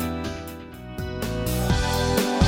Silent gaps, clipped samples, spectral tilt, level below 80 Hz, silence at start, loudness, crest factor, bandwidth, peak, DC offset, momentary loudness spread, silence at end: none; under 0.1%; -5 dB/octave; -32 dBFS; 0 s; -26 LUFS; 18 dB; 16.5 kHz; -8 dBFS; under 0.1%; 15 LU; 0 s